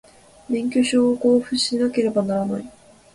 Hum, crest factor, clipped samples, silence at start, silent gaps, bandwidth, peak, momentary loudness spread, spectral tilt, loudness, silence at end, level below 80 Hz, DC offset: none; 14 dB; under 0.1%; 0.5 s; none; 11.5 kHz; -6 dBFS; 9 LU; -4.5 dB/octave; -20 LUFS; 0.45 s; -58 dBFS; under 0.1%